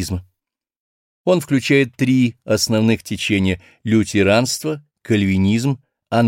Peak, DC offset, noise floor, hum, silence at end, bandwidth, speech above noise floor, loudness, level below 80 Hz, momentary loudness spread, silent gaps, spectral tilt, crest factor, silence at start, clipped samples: -2 dBFS; under 0.1%; -78 dBFS; none; 0 s; 16.5 kHz; 61 dB; -18 LUFS; -48 dBFS; 11 LU; 0.76-1.25 s; -5.5 dB/octave; 16 dB; 0 s; under 0.1%